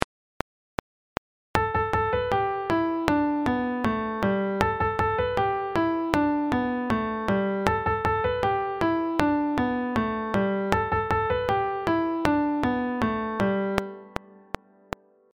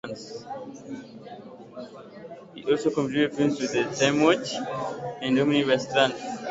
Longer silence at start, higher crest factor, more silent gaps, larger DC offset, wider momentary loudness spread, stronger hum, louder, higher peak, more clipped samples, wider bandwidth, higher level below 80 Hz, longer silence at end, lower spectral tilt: about the same, 0 s vs 0.05 s; first, 26 dB vs 20 dB; first, 0.04-1.54 s vs none; neither; second, 15 LU vs 21 LU; neither; about the same, -26 LUFS vs -25 LUFS; first, 0 dBFS vs -6 dBFS; neither; first, 16.5 kHz vs 8 kHz; first, -46 dBFS vs -64 dBFS; first, 1.25 s vs 0 s; first, -7 dB/octave vs -4.5 dB/octave